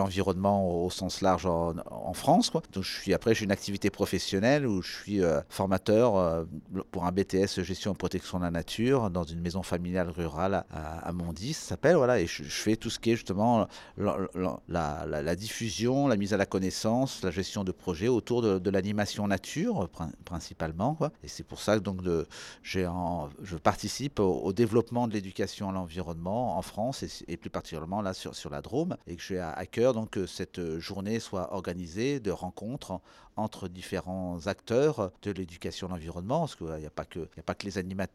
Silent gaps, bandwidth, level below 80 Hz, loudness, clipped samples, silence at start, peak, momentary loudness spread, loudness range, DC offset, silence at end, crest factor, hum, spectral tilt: none; 14.5 kHz; -52 dBFS; -31 LUFS; under 0.1%; 0 s; -8 dBFS; 11 LU; 6 LU; under 0.1%; 0.05 s; 22 dB; none; -5.5 dB/octave